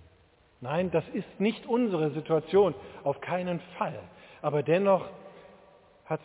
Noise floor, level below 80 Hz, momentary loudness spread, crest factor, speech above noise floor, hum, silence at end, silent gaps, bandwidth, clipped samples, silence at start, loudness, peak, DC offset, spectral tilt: -62 dBFS; -64 dBFS; 12 LU; 18 dB; 34 dB; none; 0.05 s; none; 4 kHz; under 0.1%; 0.6 s; -29 LUFS; -12 dBFS; under 0.1%; -11 dB/octave